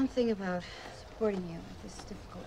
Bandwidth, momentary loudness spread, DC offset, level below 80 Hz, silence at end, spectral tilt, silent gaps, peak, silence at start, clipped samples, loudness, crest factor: 14.5 kHz; 15 LU; under 0.1%; -54 dBFS; 0 s; -6 dB/octave; none; -18 dBFS; 0 s; under 0.1%; -36 LUFS; 16 dB